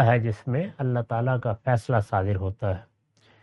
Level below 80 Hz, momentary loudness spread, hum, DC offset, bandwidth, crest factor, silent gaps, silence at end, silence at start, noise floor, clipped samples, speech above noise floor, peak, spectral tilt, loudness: -58 dBFS; 5 LU; none; under 0.1%; 11 kHz; 20 dB; none; 0.6 s; 0 s; -61 dBFS; under 0.1%; 37 dB; -6 dBFS; -8.5 dB/octave; -26 LUFS